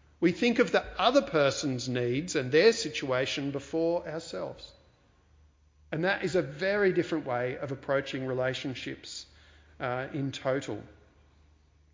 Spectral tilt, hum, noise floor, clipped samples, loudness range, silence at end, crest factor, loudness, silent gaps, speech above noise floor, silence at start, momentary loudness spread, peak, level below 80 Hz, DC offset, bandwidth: -5 dB/octave; none; -63 dBFS; under 0.1%; 8 LU; 1 s; 22 dB; -29 LUFS; none; 34 dB; 0.2 s; 14 LU; -10 dBFS; -60 dBFS; under 0.1%; 7.8 kHz